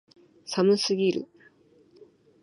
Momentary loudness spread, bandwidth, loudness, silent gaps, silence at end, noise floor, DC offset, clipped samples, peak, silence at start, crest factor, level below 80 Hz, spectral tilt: 22 LU; 11.5 kHz; -25 LUFS; none; 0.4 s; -59 dBFS; under 0.1%; under 0.1%; -10 dBFS; 0.45 s; 18 dB; -76 dBFS; -5 dB/octave